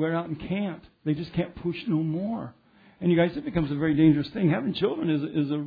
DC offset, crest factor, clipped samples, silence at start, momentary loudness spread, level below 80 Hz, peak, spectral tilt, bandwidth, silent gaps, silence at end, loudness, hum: under 0.1%; 16 dB; under 0.1%; 0 s; 10 LU; -54 dBFS; -10 dBFS; -10 dB/octave; 5 kHz; none; 0 s; -27 LUFS; none